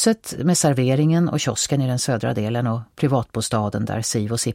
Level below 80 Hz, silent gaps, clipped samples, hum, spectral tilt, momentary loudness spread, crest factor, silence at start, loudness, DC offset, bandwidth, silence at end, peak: -52 dBFS; none; under 0.1%; none; -5 dB/octave; 6 LU; 16 dB; 0 s; -21 LUFS; under 0.1%; 16.5 kHz; 0 s; -4 dBFS